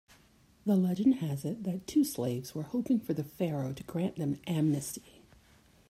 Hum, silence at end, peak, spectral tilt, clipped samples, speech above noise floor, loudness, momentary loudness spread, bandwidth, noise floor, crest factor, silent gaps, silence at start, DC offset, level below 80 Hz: none; 0.9 s; -16 dBFS; -7 dB/octave; under 0.1%; 32 dB; -32 LUFS; 8 LU; 16 kHz; -63 dBFS; 16 dB; none; 0.65 s; under 0.1%; -66 dBFS